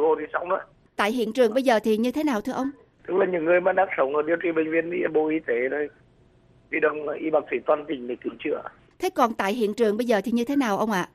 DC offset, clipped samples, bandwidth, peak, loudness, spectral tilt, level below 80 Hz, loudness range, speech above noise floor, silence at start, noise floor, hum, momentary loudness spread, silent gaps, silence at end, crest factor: under 0.1%; under 0.1%; 15 kHz; -6 dBFS; -24 LUFS; -5.5 dB/octave; -64 dBFS; 4 LU; 34 dB; 0 s; -57 dBFS; none; 9 LU; none; 0.1 s; 18 dB